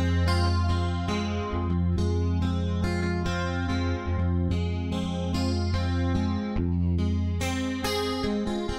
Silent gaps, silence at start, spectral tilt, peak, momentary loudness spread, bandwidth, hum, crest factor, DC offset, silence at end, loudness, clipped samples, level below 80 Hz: none; 0 s; -6.5 dB/octave; -12 dBFS; 3 LU; 13 kHz; none; 14 dB; under 0.1%; 0 s; -27 LUFS; under 0.1%; -36 dBFS